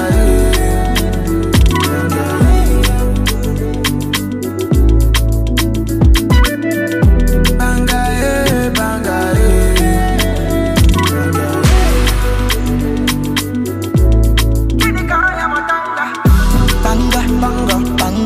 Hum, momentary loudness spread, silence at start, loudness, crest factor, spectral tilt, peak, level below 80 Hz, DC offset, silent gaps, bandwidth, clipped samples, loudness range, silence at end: none; 5 LU; 0 s; -14 LUFS; 10 dB; -5.5 dB/octave; 0 dBFS; -14 dBFS; under 0.1%; none; 16 kHz; under 0.1%; 1 LU; 0 s